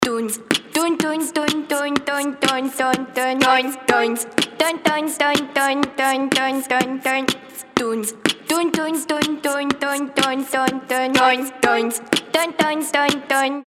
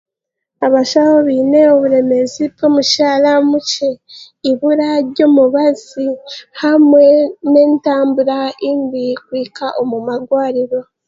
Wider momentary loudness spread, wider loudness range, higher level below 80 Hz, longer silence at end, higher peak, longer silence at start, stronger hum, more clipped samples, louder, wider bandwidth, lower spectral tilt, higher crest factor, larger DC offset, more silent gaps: second, 4 LU vs 11 LU; about the same, 2 LU vs 4 LU; about the same, -58 dBFS vs -62 dBFS; second, 0.05 s vs 0.25 s; about the same, 0 dBFS vs 0 dBFS; second, 0 s vs 0.6 s; neither; neither; second, -19 LUFS vs -13 LUFS; first, 17 kHz vs 7.8 kHz; second, -2.5 dB/octave vs -4 dB/octave; first, 20 dB vs 12 dB; neither; neither